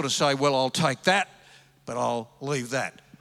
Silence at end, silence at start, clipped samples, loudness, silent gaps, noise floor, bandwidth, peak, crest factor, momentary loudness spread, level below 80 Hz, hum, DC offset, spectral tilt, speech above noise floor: 0.3 s; 0 s; under 0.1%; -26 LUFS; none; -55 dBFS; 15.5 kHz; -6 dBFS; 20 dB; 13 LU; -72 dBFS; none; under 0.1%; -3.5 dB/octave; 29 dB